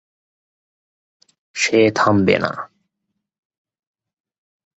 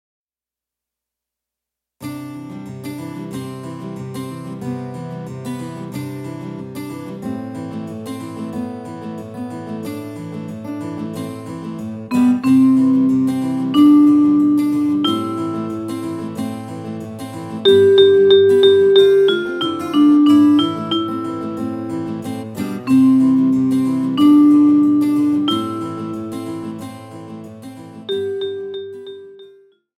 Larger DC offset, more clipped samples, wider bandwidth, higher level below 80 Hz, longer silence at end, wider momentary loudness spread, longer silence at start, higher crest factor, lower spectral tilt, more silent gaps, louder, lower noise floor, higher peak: neither; neither; second, 8.2 kHz vs 13.5 kHz; first, -52 dBFS vs -60 dBFS; first, 2.15 s vs 0.5 s; about the same, 18 LU vs 19 LU; second, 1.55 s vs 2 s; about the same, 20 dB vs 16 dB; second, -5 dB/octave vs -6.5 dB/octave; neither; about the same, -16 LUFS vs -15 LUFS; second, -77 dBFS vs under -90 dBFS; about the same, -2 dBFS vs -2 dBFS